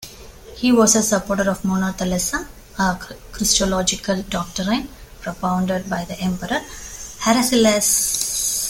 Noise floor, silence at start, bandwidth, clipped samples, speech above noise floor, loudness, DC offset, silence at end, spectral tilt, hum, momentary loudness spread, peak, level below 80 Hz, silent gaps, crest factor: -39 dBFS; 0 s; 17 kHz; under 0.1%; 20 dB; -19 LUFS; under 0.1%; 0 s; -3 dB/octave; none; 18 LU; -2 dBFS; -40 dBFS; none; 18 dB